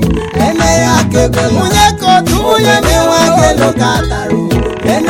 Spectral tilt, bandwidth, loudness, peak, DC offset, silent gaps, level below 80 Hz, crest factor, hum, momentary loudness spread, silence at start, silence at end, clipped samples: -4.5 dB/octave; 17.5 kHz; -10 LUFS; 0 dBFS; under 0.1%; none; -22 dBFS; 10 dB; none; 5 LU; 0 s; 0 s; under 0.1%